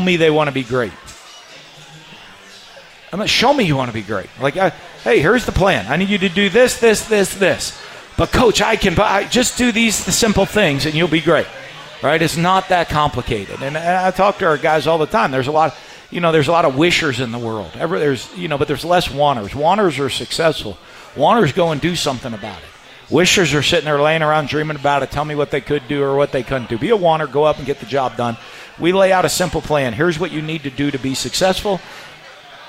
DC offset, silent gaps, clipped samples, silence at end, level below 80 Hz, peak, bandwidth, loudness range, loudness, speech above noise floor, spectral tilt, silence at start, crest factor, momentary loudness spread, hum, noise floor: under 0.1%; none; under 0.1%; 0 s; -38 dBFS; -2 dBFS; 16 kHz; 3 LU; -16 LUFS; 24 dB; -4 dB/octave; 0 s; 14 dB; 12 LU; none; -40 dBFS